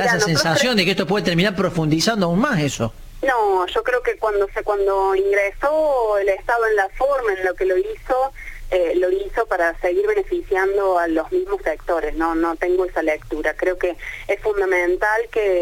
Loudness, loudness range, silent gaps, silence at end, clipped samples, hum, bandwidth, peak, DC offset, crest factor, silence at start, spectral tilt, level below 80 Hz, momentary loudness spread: -20 LUFS; 2 LU; none; 0 s; under 0.1%; none; 17 kHz; -2 dBFS; under 0.1%; 18 dB; 0 s; -4.5 dB/octave; -38 dBFS; 5 LU